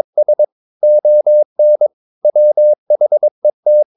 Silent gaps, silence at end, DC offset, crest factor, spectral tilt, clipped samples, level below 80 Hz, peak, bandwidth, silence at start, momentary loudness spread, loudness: 0.52-0.80 s, 1.45-1.56 s, 1.93-2.22 s, 2.78-2.86 s, 3.31-3.42 s, 3.53-3.63 s; 0.15 s; under 0.1%; 6 dB; -11 dB/octave; under 0.1%; -82 dBFS; -4 dBFS; 0.9 kHz; 0.15 s; 6 LU; -12 LUFS